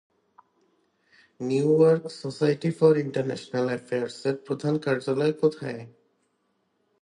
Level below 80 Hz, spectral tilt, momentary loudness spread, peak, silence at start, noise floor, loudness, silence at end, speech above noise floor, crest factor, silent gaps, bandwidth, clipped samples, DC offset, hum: -72 dBFS; -7 dB/octave; 12 LU; -6 dBFS; 1.4 s; -73 dBFS; -25 LUFS; 1.15 s; 48 dB; 20 dB; none; 10.5 kHz; under 0.1%; under 0.1%; none